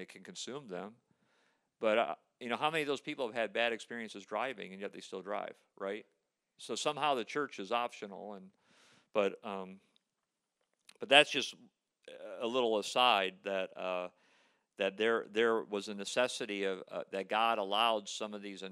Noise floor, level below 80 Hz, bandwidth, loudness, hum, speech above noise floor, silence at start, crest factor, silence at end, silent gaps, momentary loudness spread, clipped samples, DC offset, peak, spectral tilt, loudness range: -87 dBFS; under -90 dBFS; 14 kHz; -34 LUFS; none; 52 dB; 0 s; 28 dB; 0 s; none; 16 LU; under 0.1%; under 0.1%; -8 dBFS; -2.5 dB/octave; 8 LU